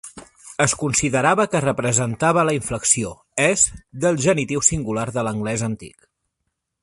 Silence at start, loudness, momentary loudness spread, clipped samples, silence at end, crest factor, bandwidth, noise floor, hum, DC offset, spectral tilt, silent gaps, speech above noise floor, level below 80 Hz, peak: 0.05 s; -19 LUFS; 7 LU; under 0.1%; 0.95 s; 22 dB; 11.5 kHz; -77 dBFS; none; under 0.1%; -4 dB/octave; none; 57 dB; -48 dBFS; 0 dBFS